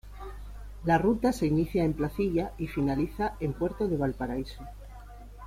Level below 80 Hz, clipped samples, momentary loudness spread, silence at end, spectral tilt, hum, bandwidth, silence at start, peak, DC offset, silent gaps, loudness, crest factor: -42 dBFS; under 0.1%; 20 LU; 0 s; -7.5 dB/octave; none; 16 kHz; 0.05 s; -12 dBFS; under 0.1%; none; -29 LUFS; 18 dB